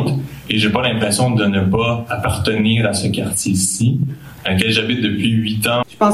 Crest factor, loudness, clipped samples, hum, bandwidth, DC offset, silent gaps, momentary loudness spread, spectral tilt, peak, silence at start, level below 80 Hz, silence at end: 16 dB; -17 LUFS; under 0.1%; none; 15.5 kHz; under 0.1%; none; 5 LU; -4.5 dB/octave; 0 dBFS; 0 s; -42 dBFS; 0 s